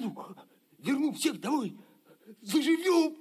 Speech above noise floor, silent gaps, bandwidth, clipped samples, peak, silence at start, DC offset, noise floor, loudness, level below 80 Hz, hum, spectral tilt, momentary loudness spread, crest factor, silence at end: 29 dB; none; 15 kHz; under 0.1%; -14 dBFS; 0 s; under 0.1%; -57 dBFS; -30 LUFS; -90 dBFS; none; -4 dB/octave; 19 LU; 18 dB; 0 s